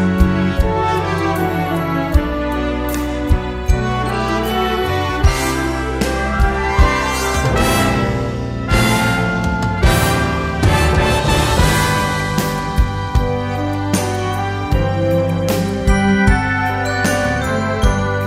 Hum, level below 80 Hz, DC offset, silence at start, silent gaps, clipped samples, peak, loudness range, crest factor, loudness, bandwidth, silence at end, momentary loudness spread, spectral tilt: none; -22 dBFS; under 0.1%; 0 s; none; under 0.1%; 0 dBFS; 3 LU; 14 dB; -17 LUFS; 16 kHz; 0 s; 6 LU; -5.5 dB/octave